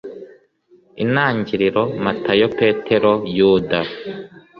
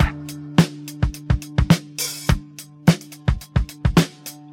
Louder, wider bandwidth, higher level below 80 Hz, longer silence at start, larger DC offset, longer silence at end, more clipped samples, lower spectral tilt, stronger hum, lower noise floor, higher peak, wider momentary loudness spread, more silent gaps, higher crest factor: first, -17 LUFS vs -21 LUFS; second, 5.8 kHz vs 17 kHz; second, -52 dBFS vs -28 dBFS; about the same, 0.05 s vs 0 s; neither; about the same, 0.2 s vs 0.2 s; neither; first, -8 dB/octave vs -5.5 dB/octave; neither; first, -54 dBFS vs -39 dBFS; about the same, -2 dBFS vs 0 dBFS; first, 16 LU vs 7 LU; neither; about the same, 16 dB vs 20 dB